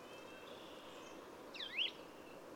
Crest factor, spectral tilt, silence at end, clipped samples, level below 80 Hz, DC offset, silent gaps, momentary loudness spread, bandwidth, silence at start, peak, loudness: 20 dB; -2 dB/octave; 0 s; under 0.1%; -80 dBFS; under 0.1%; none; 15 LU; over 20 kHz; 0 s; -28 dBFS; -46 LUFS